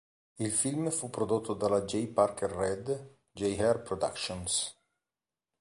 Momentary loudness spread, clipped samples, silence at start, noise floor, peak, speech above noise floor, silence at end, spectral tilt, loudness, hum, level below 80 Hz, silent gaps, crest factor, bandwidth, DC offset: 8 LU; under 0.1%; 0.4 s; under -90 dBFS; -12 dBFS; over 59 dB; 0.9 s; -4 dB/octave; -32 LUFS; none; -58 dBFS; none; 20 dB; 11.5 kHz; under 0.1%